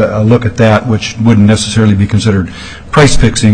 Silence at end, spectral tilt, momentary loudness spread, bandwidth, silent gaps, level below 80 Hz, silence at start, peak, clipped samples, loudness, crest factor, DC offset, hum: 0 s; -6 dB/octave; 7 LU; 10 kHz; none; -22 dBFS; 0 s; 0 dBFS; 0.5%; -9 LUFS; 8 dB; under 0.1%; none